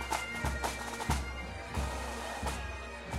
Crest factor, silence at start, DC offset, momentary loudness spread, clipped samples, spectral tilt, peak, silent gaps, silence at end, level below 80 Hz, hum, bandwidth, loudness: 20 dB; 0 s; under 0.1%; 6 LU; under 0.1%; -4 dB/octave; -18 dBFS; none; 0 s; -42 dBFS; none; 16 kHz; -37 LUFS